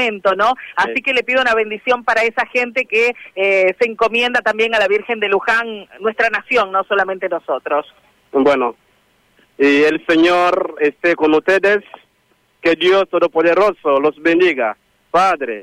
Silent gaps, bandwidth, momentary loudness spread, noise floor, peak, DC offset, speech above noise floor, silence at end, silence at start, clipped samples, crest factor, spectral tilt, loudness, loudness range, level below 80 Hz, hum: none; 12.5 kHz; 6 LU; -59 dBFS; -4 dBFS; under 0.1%; 44 dB; 0 s; 0 s; under 0.1%; 12 dB; -4 dB/octave; -15 LUFS; 3 LU; -56 dBFS; none